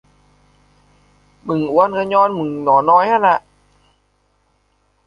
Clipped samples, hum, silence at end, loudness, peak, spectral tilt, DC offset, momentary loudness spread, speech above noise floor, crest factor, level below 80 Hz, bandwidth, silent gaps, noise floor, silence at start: under 0.1%; 50 Hz at -50 dBFS; 1.65 s; -15 LUFS; -2 dBFS; -7.5 dB/octave; under 0.1%; 9 LU; 47 dB; 16 dB; -58 dBFS; 7 kHz; none; -62 dBFS; 1.45 s